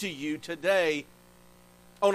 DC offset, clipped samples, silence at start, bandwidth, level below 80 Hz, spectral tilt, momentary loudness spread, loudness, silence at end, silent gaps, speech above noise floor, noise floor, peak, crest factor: under 0.1%; under 0.1%; 0 s; 15.5 kHz; -66 dBFS; -4 dB/octave; 9 LU; -29 LUFS; 0 s; none; 27 dB; -56 dBFS; -12 dBFS; 18 dB